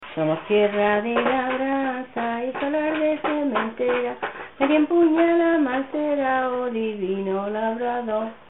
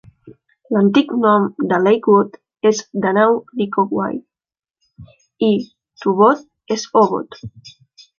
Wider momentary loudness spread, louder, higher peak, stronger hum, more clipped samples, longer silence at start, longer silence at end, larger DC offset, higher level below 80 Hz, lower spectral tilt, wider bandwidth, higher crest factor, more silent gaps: second, 8 LU vs 11 LU; second, -23 LUFS vs -17 LUFS; second, -6 dBFS vs -2 dBFS; neither; neither; second, 0 s vs 0.25 s; second, 0.15 s vs 0.5 s; first, 0.2% vs under 0.1%; about the same, -60 dBFS vs -60 dBFS; first, -10 dB/octave vs -6 dB/octave; second, 4 kHz vs 7.2 kHz; about the same, 16 dB vs 16 dB; neither